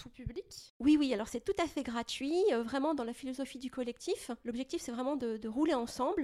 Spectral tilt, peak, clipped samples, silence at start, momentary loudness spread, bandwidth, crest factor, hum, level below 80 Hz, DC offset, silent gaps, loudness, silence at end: -4.5 dB/octave; -18 dBFS; under 0.1%; 0 s; 11 LU; 14 kHz; 16 dB; none; -58 dBFS; under 0.1%; 0.70-0.80 s; -35 LUFS; 0 s